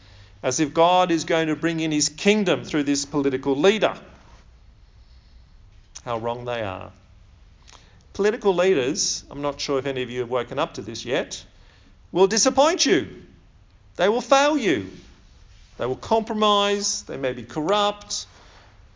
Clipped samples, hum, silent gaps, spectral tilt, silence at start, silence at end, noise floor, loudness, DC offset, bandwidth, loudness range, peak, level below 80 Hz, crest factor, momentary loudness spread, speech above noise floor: under 0.1%; none; none; -3.5 dB/octave; 0.2 s; 0.7 s; -52 dBFS; -22 LUFS; under 0.1%; 7.6 kHz; 9 LU; -4 dBFS; -52 dBFS; 20 dB; 13 LU; 30 dB